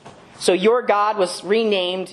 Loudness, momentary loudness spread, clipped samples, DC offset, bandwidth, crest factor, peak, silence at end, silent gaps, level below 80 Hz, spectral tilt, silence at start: -19 LUFS; 5 LU; under 0.1%; under 0.1%; 13 kHz; 16 dB; -2 dBFS; 0 s; none; -68 dBFS; -4 dB/octave; 0.05 s